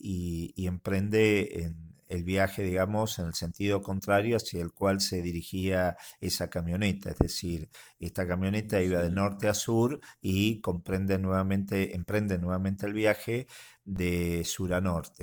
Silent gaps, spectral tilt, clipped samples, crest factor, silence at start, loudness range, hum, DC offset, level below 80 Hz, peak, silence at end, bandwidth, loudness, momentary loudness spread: none; -5.5 dB/octave; under 0.1%; 26 dB; 0.05 s; 2 LU; none; under 0.1%; -50 dBFS; -4 dBFS; 0 s; over 20 kHz; -30 LUFS; 9 LU